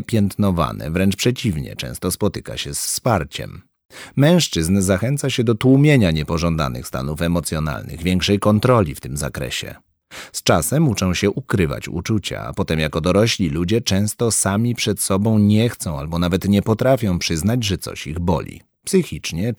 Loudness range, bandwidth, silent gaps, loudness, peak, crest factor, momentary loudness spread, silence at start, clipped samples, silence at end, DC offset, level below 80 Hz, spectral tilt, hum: 3 LU; over 20 kHz; 3.85-3.89 s; -19 LUFS; -2 dBFS; 16 dB; 11 LU; 0 s; under 0.1%; 0 s; under 0.1%; -38 dBFS; -5 dB/octave; none